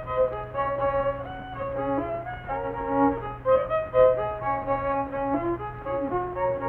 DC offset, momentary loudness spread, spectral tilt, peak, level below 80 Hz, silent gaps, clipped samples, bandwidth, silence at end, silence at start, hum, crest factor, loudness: under 0.1%; 10 LU; -9.5 dB/octave; -8 dBFS; -46 dBFS; none; under 0.1%; 4.1 kHz; 0 s; 0 s; none; 18 dB; -27 LUFS